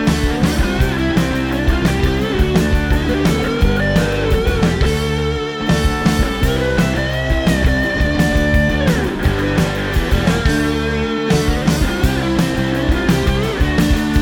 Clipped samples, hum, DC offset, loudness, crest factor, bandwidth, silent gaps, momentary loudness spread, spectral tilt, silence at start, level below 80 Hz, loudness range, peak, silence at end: under 0.1%; none; under 0.1%; -16 LUFS; 14 dB; 18 kHz; none; 3 LU; -6 dB/octave; 0 s; -20 dBFS; 1 LU; 0 dBFS; 0 s